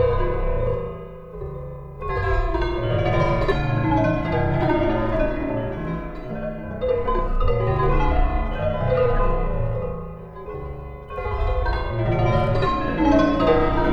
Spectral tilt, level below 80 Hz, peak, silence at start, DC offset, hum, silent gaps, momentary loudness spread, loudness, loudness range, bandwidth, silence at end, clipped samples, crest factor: -8.5 dB/octave; -26 dBFS; -4 dBFS; 0 s; under 0.1%; none; none; 14 LU; -23 LUFS; 4 LU; 6.4 kHz; 0 s; under 0.1%; 16 dB